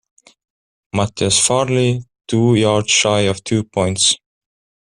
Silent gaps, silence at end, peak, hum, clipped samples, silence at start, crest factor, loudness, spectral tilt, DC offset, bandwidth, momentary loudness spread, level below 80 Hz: none; 0.8 s; -2 dBFS; none; under 0.1%; 0.95 s; 16 dB; -16 LUFS; -3.5 dB/octave; under 0.1%; 12.5 kHz; 8 LU; -50 dBFS